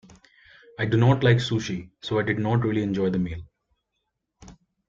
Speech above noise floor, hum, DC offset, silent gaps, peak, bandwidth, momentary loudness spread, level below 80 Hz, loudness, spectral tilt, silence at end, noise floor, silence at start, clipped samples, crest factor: 56 dB; none; under 0.1%; none; -6 dBFS; 7.4 kHz; 13 LU; -54 dBFS; -24 LUFS; -7 dB/octave; 0.35 s; -79 dBFS; 0.8 s; under 0.1%; 20 dB